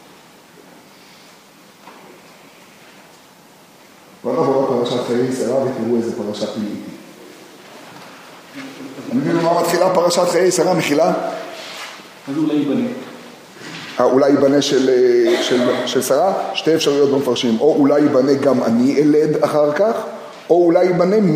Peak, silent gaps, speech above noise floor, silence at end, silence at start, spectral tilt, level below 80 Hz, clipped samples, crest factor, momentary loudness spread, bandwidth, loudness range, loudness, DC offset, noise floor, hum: 0 dBFS; none; 30 dB; 0 s; 1.85 s; -5 dB/octave; -68 dBFS; under 0.1%; 18 dB; 19 LU; 15.5 kHz; 9 LU; -16 LUFS; under 0.1%; -45 dBFS; none